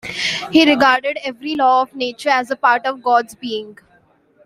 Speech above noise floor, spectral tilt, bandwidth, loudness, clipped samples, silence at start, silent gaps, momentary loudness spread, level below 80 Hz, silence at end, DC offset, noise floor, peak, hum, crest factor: 39 dB; -3 dB/octave; 14.5 kHz; -16 LUFS; under 0.1%; 0.05 s; none; 13 LU; -60 dBFS; 0.7 s; under 0.1%; -55 dBFS; -2 dBFS; none; 16 dB